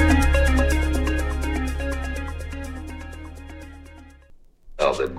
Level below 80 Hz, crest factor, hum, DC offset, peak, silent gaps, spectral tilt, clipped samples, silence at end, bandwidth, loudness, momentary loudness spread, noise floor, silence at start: -26 dBFS; 18 dB; none; under 0.1%; -6 dBFS; none; -6 dB/octave; under 0.1%; 0 s; 14 kHz; -24 LUFS; 21 LU; -49 dBFS; 0 s